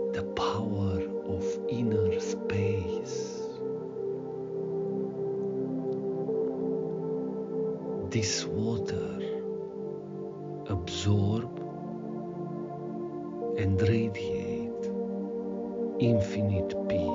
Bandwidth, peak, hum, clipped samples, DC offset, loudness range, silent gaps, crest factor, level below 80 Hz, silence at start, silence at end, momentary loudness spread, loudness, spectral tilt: 7.6 kHz; -14 dBFS; none; under 0.1%; under 0.1%; 3 LU; none; 18 dB; -60 dBFS; 0 s; 0 s; 10 LU; -32 LUFS; -6.5 dB/octave